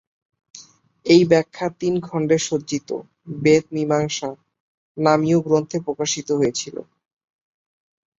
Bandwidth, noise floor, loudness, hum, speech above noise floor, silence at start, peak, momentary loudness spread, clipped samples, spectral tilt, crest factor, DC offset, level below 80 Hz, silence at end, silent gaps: 8 kHz; -47 dBFS; -20 LUFS; none; 27 dB; 0.55 s; -2 dBFS; 15 LU; under 0.1%; -5 dB/octave; 20 dB; under 0.1%; -62 dBFS; 1.35 s; 4.60-4.95 s